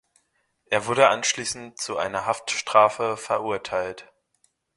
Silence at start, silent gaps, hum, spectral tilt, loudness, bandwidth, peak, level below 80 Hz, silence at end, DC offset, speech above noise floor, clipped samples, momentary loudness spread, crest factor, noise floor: 0.7 s; none; none; -2 dB/octave; -23 LUFS; 11.5 kHz; 0 dBFS; -64 dBFS; 0.75 s; under 0.1%; 47 dB; under 0.1%; 12 LU; 24 dB; -70 dBFS